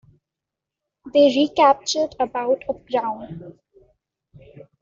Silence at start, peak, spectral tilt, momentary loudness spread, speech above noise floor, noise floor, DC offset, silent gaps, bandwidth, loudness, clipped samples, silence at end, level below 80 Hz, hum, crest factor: 1.05 s; -4 dBFS; -4 dB/octave; 15 LU; 66 dB; -85 dBFS; under 0.1%; none; 7.8 kHz; -20 LUFS; under 0.1%; 1.3 s; -60 dBFS; none; 20 dB